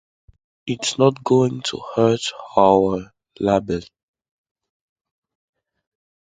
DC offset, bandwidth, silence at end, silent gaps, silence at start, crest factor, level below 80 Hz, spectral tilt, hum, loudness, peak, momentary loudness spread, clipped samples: under 0.1%; 9.4 kHz; 2.5 s; none; 0.65 s; 22 dB; -52 dBFS; -5.5 dB/octave; none; -19 LUFS; 0 dBFS; 13 LU; under 0.1%